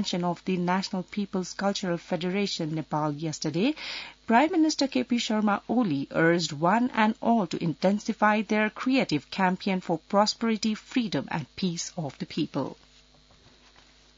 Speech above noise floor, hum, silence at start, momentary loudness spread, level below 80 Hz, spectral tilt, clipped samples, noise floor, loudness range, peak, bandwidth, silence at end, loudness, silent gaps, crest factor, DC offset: 31 dB; none; 0 s; 8 LU; -64 dBFS; -5 dB/octave; under 0.1%; -57 dBFS; 5 LU; -8 dBFS; 7.8 kHz; 1.45 s; -27 LUFS; none; 20 dB; under 0.1%